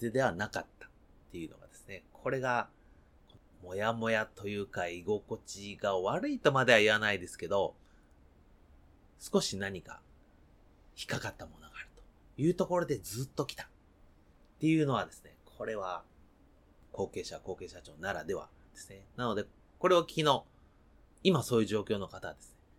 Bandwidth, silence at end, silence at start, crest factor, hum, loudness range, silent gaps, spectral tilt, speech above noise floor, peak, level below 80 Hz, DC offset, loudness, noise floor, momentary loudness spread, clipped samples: 17 kHz; 0.3 s; 0 s; 26 dB; none; 10 LU; none; -5 dB/octave; 30 dB; -10 dBFS; -62 dBFS; under 0.1%; -33 LUFS; -63 dBFS; 21 LU; under 0.1%